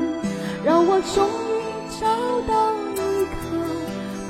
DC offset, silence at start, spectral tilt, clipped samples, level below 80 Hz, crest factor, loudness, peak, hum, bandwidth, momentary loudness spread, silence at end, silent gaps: under 0.1%; 0 s; -5 dB/octave; under 0.1%; -44 dBFS; 16 dB; -22 LUFS; -6 dBFS; none; 16.5 kHz; 9 LU; 0 s; none